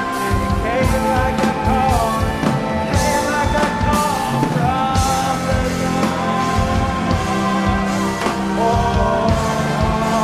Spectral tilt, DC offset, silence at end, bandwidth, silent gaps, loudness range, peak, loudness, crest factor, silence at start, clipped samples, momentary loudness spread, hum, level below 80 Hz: -5.5 dB/octave; under 0.1%; 0 s; 16 kHz; none; 1 LU; -4 dBFS; -18 LUFS; 14 dB; 0 s; under 0.1%; 2 LU; none; -28 dBFS